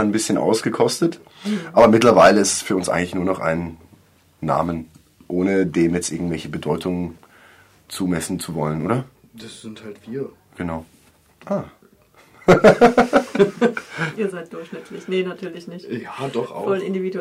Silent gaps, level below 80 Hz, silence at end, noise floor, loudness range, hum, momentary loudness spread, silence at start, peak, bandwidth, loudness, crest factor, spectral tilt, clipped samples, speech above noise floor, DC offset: none; -50 dBFS; 0 s; -53 dBFS; 10 LU; none; 21 LU; 0 s; -2 dBFS; 16 kHz; -19 LUFS; 18 dB; -5 dB/octave; under 0.1%; 34 dB; under 0.1%